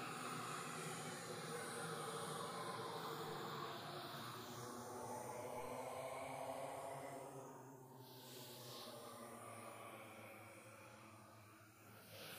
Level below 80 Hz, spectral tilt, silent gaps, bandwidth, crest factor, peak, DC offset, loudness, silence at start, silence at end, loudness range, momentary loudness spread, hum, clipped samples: -84 dBFS; -3.5 dB/octave; none; 15.5 kHz; 14 dB; -36 dBFS; under 0.1%; -50 LUFS; 0 s; 0 s; 8 LU; 12 LU; none; under 0.1%